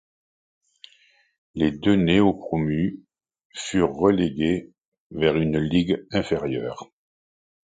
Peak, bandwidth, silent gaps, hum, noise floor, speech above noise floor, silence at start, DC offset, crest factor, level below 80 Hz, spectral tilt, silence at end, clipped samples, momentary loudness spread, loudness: -4 dBFS; 9.4 kHz; 3.45-3.50 s, 4.88-4.92 s, 5.00-5.10 s; none; -60 dBFS; 38 dB; 1.55 s; under 0.1%; 20 dB; -48 dBFS; -6.5 dB/octave; 0.9 s; under 0.1%; 15 LU; -23 LUFS